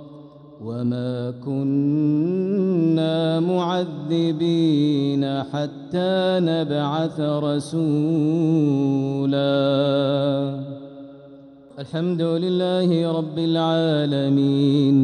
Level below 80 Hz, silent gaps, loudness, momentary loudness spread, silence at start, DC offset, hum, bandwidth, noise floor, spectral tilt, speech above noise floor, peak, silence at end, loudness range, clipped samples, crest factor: -66 dBFS; none; -21 LUFS; 8 LU; 0 s; under 0.1%; none; 10.5 kHz; -45 dBFS; -8 dB/octave; 24 dB; -8 dBFS; 0 s; 3 LU; under 0.1%; 12 dB